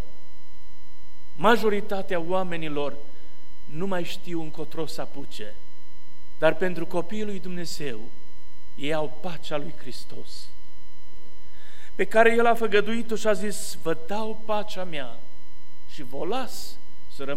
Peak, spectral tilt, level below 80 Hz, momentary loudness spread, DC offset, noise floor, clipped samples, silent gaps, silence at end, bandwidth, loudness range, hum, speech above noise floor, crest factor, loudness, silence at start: -4 dBFS; -5 dB/octave; -56 dBFS; 20 LU; 10%; -54 dBFS; under 0.1%; none; 0 s; 16.5 kHz; 11 LU; none; 27 dB; 24 dB; -27 LUFS; 0 s